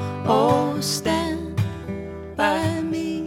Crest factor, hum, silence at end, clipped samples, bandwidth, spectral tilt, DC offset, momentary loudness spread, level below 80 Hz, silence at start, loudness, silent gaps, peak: 18 dB; none; 0 s; under 0.1%; 16.5 kHz; -5 dB/octave; under 0.1%; 13 LU; -50 dBFS; 0 s; -23 LUFS; none; -4 dBFS